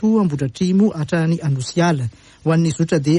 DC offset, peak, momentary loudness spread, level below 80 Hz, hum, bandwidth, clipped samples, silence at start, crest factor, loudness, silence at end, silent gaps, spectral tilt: under 0.1%; -4 dBFS; 5 LU; -52 dBFS; none; 11 kHz; under 0.1%; 0 s; 12 dB; -18 LUFS; 0 s; none; -7 dB/octave